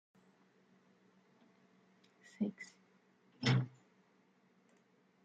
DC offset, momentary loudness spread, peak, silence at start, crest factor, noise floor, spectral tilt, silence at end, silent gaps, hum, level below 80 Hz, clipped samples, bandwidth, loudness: under 0.1%; 19 LU; -20 dBFS; 2.4 s; 24 dB; -72 dBFS; -6 dB/octave; 1.55 s; none; none; -82 dBFS; under 0.1%; 7.8 kHz; -38 LUFS